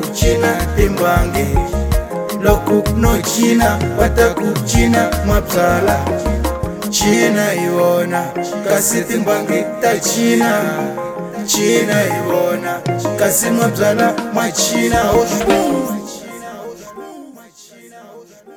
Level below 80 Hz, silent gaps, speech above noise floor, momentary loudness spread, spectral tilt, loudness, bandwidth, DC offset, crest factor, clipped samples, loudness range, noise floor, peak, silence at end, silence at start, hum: -26 dBFS; none; 27 dB; 9 LU; -4.5 dB/octave; -15 LUFS; 19.5 kHz; under 0.1%; 16 dB; under 0.1%; 2 LU; -41 dBFS; 0 dBFS; 0 s; 0 s; none